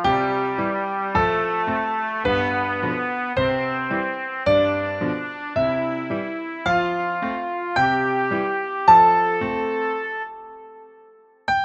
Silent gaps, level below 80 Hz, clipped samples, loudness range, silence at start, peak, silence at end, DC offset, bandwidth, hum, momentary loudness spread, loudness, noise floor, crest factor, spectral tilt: none; -48 dBFS; under 0.1%; 4 LU; 0 s; -2 dBFS; 0 s; under 0.1%; 8 kHz; none; 8 LU; -22 LUFS; -51 dBFS; 20 dB; -6.5 dB/octave